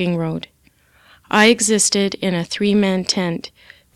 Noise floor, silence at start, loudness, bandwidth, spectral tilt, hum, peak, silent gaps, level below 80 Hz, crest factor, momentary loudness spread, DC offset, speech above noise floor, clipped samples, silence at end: -55 dBFS; 0 s; -17 LUFS; 14.5 kHz; -3.5 dB/octave; none; -2 dBFS; none; -56 dBFS; 18 dB; 16 LU; under 0.1%; 37 dB; under 0.1%; 0.45 s